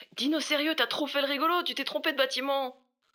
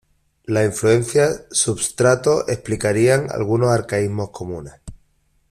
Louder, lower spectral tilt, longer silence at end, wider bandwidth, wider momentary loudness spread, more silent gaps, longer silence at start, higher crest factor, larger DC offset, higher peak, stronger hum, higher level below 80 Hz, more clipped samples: second, -28 LUFS vs -18 LUFS; second, -1.5 dB/octave vs -5 dB/octave; second, 0.4 s vs 0.6 s; first, over 20 kHz vs 14.5 kHz; second, 4 LU vs 13 LU; neither; second, 0 s vs 0.5 s; about the same, 18 dB vs 16 dB; neither; second, -12 dBFS vs -4 dBFS; neither; second, under -90 dBFS vs -48 dBFS; neither